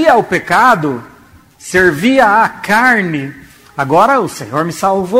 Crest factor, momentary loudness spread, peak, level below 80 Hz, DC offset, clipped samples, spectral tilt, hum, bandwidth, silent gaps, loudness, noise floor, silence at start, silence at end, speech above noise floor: 12 dB; 12 LU; 0 dBFS; -46 dBFS; under 0.1%; under 0.1%; -5 dB/octave; none; 16.5 kHz; none; -11 LUFS; -42 dBFS; 0 s; 0 s; 31 dB